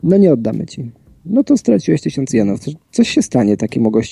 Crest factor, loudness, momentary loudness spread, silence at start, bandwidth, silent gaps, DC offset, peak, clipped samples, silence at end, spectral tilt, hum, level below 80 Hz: 14 dB; -15 LUFS; 11 LU; 0.05 s; 11.5 kHz; none; under 0.1%; -2 dBFS; under 0.1%; 0 s; -6.5 dB/octave; none; -50 dBFS